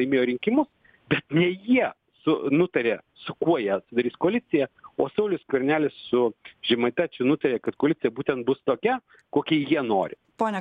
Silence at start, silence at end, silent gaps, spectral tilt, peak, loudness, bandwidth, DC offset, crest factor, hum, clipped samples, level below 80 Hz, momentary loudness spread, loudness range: 0 s; 0 s; none; -8 dB/octave; -8 dBFS; -25 LUFS; 8.2 kHz; under 0.1%; 18 dB; none; under 0.1%; -66 dBFS; 6 LU; 1 LU